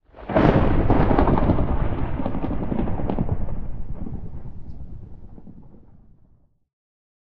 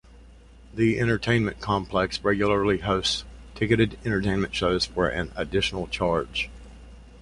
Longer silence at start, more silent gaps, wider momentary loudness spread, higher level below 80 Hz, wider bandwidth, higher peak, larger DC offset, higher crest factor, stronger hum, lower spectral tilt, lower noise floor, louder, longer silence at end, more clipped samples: about the same, 0 s vs 0.1 s; neither; first, 22 LU vs 7 LU; first, -28 dBFS vs -42 dBFS; second, 4.9 kHz vs 11.5 kHz; first, 0 dBFS vs -6 dBFS; neither; about the same, 22 dB vs 20 dB; neither; first, -10.5 dB/octave vs -5.5 dB/octave; first, -56 dBFS vs -49 dBFS; about the same, -23 LUFS vs -25 LUFS; first, 0.55 s vs 0 s; neither